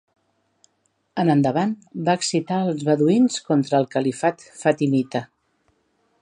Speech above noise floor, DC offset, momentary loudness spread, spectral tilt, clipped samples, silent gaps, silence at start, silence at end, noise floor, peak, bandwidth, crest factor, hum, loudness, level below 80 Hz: 49 dB; under 0.1%; 7 LU; -6 dB/octave; under 0.1%; none; 1.15 s; 0.95 s; -69 dBFS; -4 dBFS; 10.5 kHz; 18 dB; none; -21 LUFS; -70 dBFS